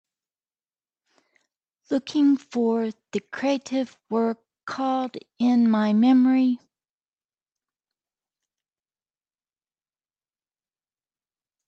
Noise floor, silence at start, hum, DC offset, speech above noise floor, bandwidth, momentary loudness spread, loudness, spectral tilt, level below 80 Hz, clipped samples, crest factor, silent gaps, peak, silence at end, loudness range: under -90 dBFS; 1.9 s; none; under 0.1%; over 68 dB; 7.8 kHz; 14 LU; -23 LUFS; -6.5 dB/octave; -78 dBFS; under 0.1%; 14 dB; 4.63-4.67 s; -12 dBFS; 5.1 s; 5 LU